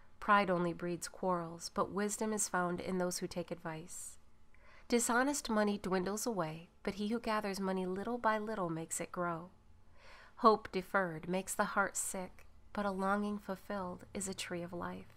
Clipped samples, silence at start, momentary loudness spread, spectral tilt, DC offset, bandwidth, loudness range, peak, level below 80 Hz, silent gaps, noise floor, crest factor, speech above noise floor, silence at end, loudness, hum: under 0.1%; 0.05 s; 13 LU; -4 dB/octave; under 0.1%; 16 kHz; 3 LU; -14 dBFS; -62 dBFS; none; -58 dBFS; 24 dB; 22 dB; 0.05 s; -37 LUFS; none